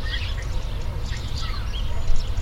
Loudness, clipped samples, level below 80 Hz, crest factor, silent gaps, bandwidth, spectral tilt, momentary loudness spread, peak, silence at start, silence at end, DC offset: -30 LUFS; under 0.1%; -24 dBFS; 16 dB; none; 8 kHz; -4.5 dB/octave; 3 LU; -6 dBFS; 0 s; 0 s; under 0.1%